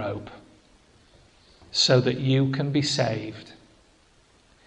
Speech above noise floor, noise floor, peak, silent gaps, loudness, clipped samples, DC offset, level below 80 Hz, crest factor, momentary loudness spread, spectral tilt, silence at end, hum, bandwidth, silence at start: 36 dB; -59 dBFS; -8 dBFS; none; -23 LUFS; under 0.1%; under 0.1%; -58 dBFS; 20 dB; 19 LU; -5 dB/octave; 1.15 s; none; 9.8 kHz; 0 s